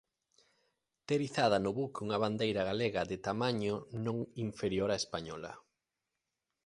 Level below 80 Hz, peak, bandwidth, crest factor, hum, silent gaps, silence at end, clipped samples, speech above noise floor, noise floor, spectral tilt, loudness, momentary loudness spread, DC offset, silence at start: -64 dBFS; -16 dBFS; 11.5 kHz; 20 dB; none; none; 1.05 s; under 0.1%; 54 dB; -88 dBFS; -5.5 dB/octave; -35 LUFS; 11 LU; under 0.1%; 1.1 s